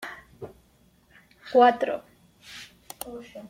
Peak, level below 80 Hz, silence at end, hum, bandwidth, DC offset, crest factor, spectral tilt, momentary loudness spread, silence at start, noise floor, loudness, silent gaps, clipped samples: -6 dBFS; -64 dBFS; 0.05 s; none; 16.5 kHz; under 0.1%; 22 dB; -4 dB/octave; 25 LU; 0 s; -61 dBFS; -22 LUFS; none; under 0.1%